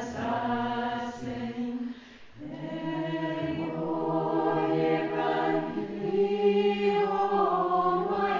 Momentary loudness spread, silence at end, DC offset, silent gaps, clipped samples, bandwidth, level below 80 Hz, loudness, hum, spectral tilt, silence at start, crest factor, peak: 10 LU; 0 s; under 0.1%; none; under 0.1%; 7.4 kHz; -62 dBFS; -28 LUFS; none; -7 dB/octave; 0 s; 16 dB; -14 dBFS